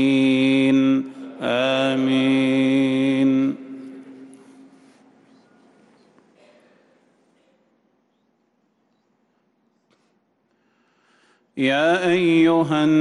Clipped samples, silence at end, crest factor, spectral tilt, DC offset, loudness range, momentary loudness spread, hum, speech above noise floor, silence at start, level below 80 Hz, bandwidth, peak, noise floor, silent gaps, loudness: under 0.1%; 0 s; 14 dB; -6 dB/octave; under 0.1%; 11 LU; 17 LU; none; 50 dB; 0 s; -68 dBFS; 10.5 kHz; -8 dBFS; -67 dBFS; none; -19 LUFS